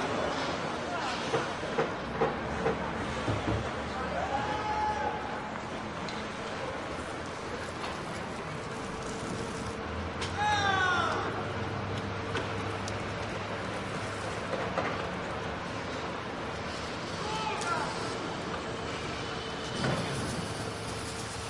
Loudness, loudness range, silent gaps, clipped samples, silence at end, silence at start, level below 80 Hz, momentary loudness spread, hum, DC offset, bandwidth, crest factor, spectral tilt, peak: -33 LUFS; 5 LU; none; under 0.1%; 0 s; 0 s; -52 dBFS; 6 LU; none; under 0.1%; 11.5 kHz; 18 dB; -4.5 dB/octave; -14 dBFS